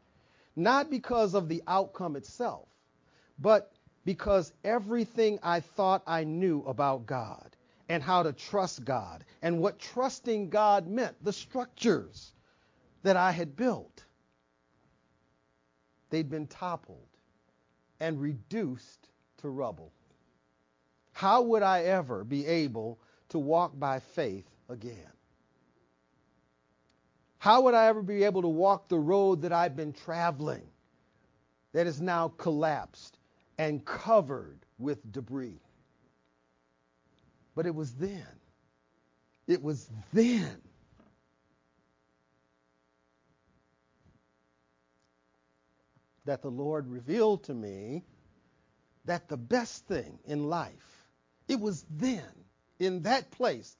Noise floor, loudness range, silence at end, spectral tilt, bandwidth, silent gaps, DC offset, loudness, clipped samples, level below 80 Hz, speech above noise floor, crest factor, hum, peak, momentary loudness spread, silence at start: -73 dBFS; 13 LU; 0.1 s; -6 dB/octave; 7.6 kHz; none; under 0.1%; -30 LUFS; under 0.1%; -64 dBFS; 43 dB; 24 dB; none; -8 dBFS; 15 LU; 0.55 s